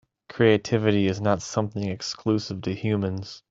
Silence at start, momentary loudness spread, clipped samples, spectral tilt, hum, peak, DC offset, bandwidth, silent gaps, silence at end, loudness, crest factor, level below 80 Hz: 0.3 s; 10 LU; under 0.1%; -6 dB/octave; none; -6 dBFS; under 0.1%; 7.8 kHz; none; 0.1 s; -25 LUFS; 20 dB; -60 dBFS